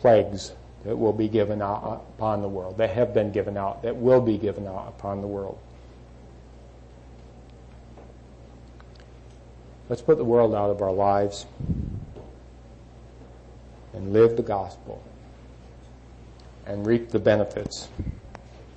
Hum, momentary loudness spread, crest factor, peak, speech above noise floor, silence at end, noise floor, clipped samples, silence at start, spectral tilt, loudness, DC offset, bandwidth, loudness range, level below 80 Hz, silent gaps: none; 22 LU; 20 dB; -8 dBFS; 23 dB; 0 s; -46 dBFS; under 0.1%; 0 s; -7 dB/octave; -25 LUFS; under 0.1%; 8.6 kHz; 8 LU; -46 dBFS; none